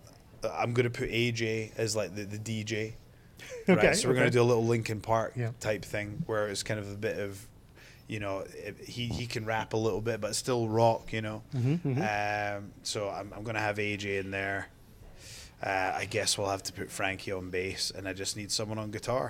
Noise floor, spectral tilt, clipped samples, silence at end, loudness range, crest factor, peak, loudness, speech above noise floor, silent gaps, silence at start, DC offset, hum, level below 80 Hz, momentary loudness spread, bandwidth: -54 dBFS; -4.5 dB/octave; under 0.1%; 0 s; 7 LU; 22 dB; -10 dBFS; -31 LUFS; 23 dB; none; 0.05 s; under 0.1%; none; -56 dBFS; 12 LU; 16.5 kHz